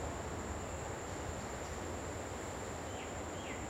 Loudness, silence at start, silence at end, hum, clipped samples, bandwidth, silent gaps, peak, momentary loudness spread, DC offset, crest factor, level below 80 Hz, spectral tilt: -43 LUFS; 0 s; 0 s; none; under 0.1%; 16.5 kHz; none; -28 dBFS; 1 LU; under 0.1%; 14 dB; -54 dBFS; -4.5 dB/octave